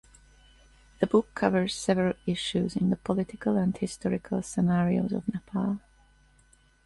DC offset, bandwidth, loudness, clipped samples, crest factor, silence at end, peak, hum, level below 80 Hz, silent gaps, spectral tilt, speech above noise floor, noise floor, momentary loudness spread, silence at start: under 0.1%; 11.5 kHz; -28 LUFS; under 0.1%; 20 dB; 1.1 s; -8 dBFS; none; -56 dBFS; none; -6.5 dB/octave; 34 dB; -62 dBFS; 6 LU; 1 s